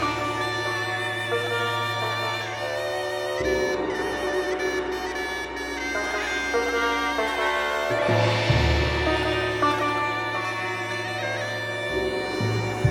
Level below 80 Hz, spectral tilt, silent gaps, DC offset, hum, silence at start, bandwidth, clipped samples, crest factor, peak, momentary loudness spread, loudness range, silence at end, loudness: -40 dBFS; -4.5 dB/octave; none; under 0.1%; none; 0 s; 17 kHz; under 0.1%; 18 dB; -8 dBFS; 6 LU; 4 LU; 0 s; -25 LUFS